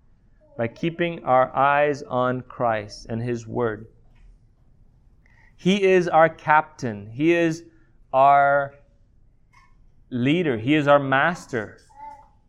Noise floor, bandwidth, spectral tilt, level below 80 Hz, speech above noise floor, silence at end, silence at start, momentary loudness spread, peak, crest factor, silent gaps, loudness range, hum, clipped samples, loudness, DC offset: -56 dBFS; 11 kHz; -6.5 dB/octave; -54 dBFS; 35 dB; 0.35 s; 0.6 s; 14 LU; -2 dBFS; 20 dB; none; 8 LU; none; under 0.1%; -21 LUFS; under 0.1%